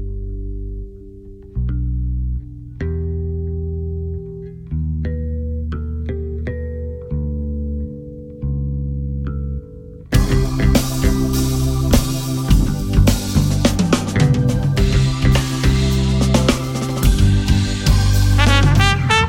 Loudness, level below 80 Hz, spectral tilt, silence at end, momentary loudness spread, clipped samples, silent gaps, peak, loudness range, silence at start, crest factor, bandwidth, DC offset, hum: -18 LUFS; -22 dBFS; -5.5 dB/octave; 0 s; 14 LU; under 0.1%; none; 0 dBFS; 9 LU; 0 s; 16 dB; 16.5 kHz; under 0.1%; none